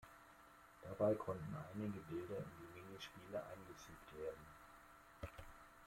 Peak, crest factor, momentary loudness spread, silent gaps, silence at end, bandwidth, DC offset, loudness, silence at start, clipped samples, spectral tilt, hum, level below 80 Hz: -26 dBFS; 22 dB; 22 LU; none; 0 s; 16.5 kHz; under 0.1%; -48 LUFS; 0 s; under 0.1%; -6.5 dB/octave; none; -70 dBFS